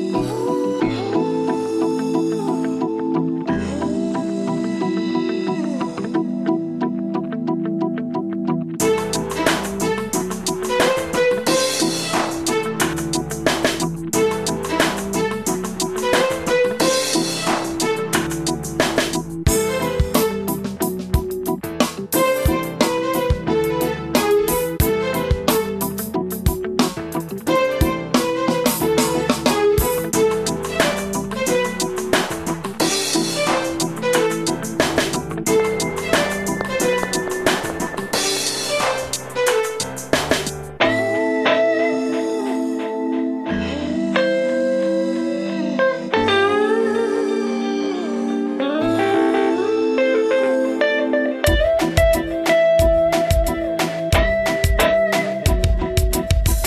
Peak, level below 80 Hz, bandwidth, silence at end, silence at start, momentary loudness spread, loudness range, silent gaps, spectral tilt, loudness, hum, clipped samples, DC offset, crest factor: 0 dBFS; -32 dBFS; 14 kHz; 0 s; 0 s; 6 LU; 4 LU; none; -4.5 dB/octave; -20 LUFS; none; under 0.1%; under 0.1%; 20 dB